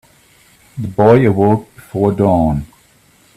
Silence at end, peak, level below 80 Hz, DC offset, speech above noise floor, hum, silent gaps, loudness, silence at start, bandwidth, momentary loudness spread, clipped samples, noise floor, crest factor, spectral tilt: 0.7 s; 0 dBFS; -38 dBFS; under 0.1%; 38 dB; none; none; -13 LUFS; 0.75 s; 14 kHz; 16 LU; under 0.1%; -50 dBFS; 14 dB; -9 dB/octave